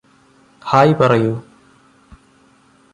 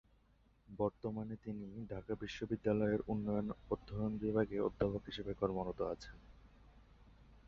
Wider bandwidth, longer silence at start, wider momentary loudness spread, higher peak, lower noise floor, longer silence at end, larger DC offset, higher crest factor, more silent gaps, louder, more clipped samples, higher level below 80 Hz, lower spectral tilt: first, 11 kHz vs 7 kHz; about the same, 0.65 s vs 0.7 s; first, 17 LU vs 11 LU; first, -2 dBFS vs -20 dBFS; second, -52 dBFS vs -71 dBFS; first, 1.5 s vs 0.1 s; neither; about the same, 18 dB vs 20 dB; neither; first, -14 LUFS vs -40 LUFS; neither; first, -54 dBFS vs -60 dBFS; about the same, -7.5 dB/octave vs -6.5 dB/octave